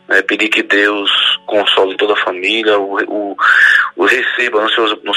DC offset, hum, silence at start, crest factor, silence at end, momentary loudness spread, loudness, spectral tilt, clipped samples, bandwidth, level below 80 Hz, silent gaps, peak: under 0.1%; none; 0.1 s; 12 dB; 0 s; 6 LU; -11 LUFS; -2 dB/octave; under 0.1%; 15 kHz; -64 dBFS; none; 0 dBFS